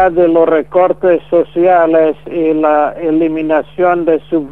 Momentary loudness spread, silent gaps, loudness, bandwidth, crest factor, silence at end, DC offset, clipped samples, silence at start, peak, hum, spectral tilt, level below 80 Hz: 5 LU; none; -12 LUFS; 3.9 kHz; 12 dB; 0 s; 1%; under 0.1%; 0 s; 0 dBFS; none; -9 dB/octave; -46 dBFS